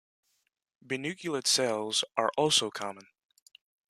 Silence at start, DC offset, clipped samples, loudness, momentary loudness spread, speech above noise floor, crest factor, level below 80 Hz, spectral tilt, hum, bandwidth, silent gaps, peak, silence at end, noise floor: 0.9 s; under 0.1%; under 0.1%; -28 LUFS; 12 LU; 47 dB; 22 dB; -78 dBFS; -2 dB/octave; none; 14 kHz; none; -10 dBFS; 0.9 s; -77 dBFS